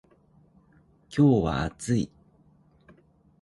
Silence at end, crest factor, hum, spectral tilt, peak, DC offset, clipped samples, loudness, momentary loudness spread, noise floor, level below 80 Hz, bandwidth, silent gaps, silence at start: 1.35 s; 20 dB; none; -7 dB/octave; -8 dBFS; under 0.1%; under 0.1%; -25 LUFS; 12 LU; -60 dBFS; -48 dBFS; 11.5 kHz; none; 1.1 s